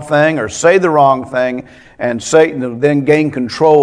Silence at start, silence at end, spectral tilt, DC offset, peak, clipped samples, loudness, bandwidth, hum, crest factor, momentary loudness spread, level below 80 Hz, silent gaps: 0 s; 0 s; -5.5 dB/octave; under 0.1%; 0 dBFS; 0.3%; -13 LUFS; 10.5 kHz; none; 12 dB; 9 LU; -50 dBFS; none